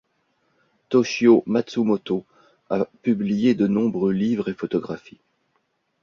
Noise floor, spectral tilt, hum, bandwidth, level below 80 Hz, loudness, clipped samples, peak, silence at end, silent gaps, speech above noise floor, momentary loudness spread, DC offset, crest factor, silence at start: -71 dBFS; -7 dB/octave; none; 7.2 kHz; -62 dBFS; -22 LUFS; under 0.1%; -4 dBFS; 1.05 s; none; 50 dB; 11 LU; under 0.1%; 20 dB; 0.9 s